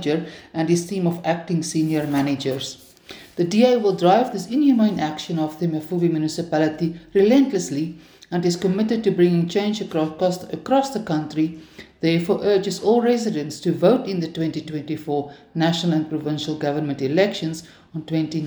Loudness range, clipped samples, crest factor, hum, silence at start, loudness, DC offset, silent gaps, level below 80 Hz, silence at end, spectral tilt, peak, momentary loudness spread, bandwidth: 3 LU; under 0.1%; 18 dB; none; 0 s; -21 LUFS; under 0.1%; none; -60 dBFS; 0 s; -6 dB/octave; -4 dBFS; 11 LU; over 20 kHz